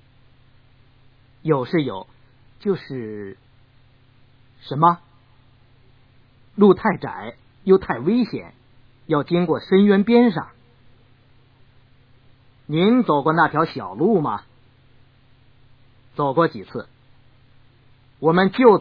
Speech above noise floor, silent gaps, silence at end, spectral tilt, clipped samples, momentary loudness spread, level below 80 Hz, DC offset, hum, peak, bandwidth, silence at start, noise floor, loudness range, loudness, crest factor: 35 dB; none; 0 s; -10 dB/octave; under 0.1%; 19 LU; -58 dBFS; under 0.1%; none; -2 dBFS; 5.2 kHz; 1.45 s; -53 dBFS; 7 LU; -19 LUFS; 20 dB